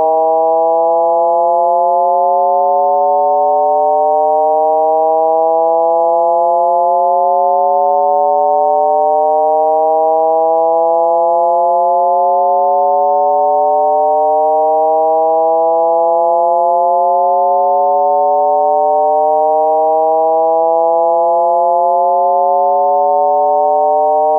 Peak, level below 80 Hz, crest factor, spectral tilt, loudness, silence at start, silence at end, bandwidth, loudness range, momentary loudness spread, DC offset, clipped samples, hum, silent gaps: -2 dBFS; under -90 dBFS; 8 dB; -13 dB/octave; -11 LUFS; 0 s; 0 s; 1.4 kHz; 0 LU; 0 LU; under 0.1%; under 0.1%; none; none